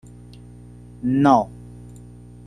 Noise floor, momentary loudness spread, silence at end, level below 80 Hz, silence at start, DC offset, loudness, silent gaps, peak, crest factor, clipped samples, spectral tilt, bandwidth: -42 dBFS; 26 LU; 0.5 s; -48 dBFS; 1.05 s; under 0.1%; -19 LUFS; none; -2 dBFS; 22 dB; under 0.1%; -8 dB/octave; 10 kHz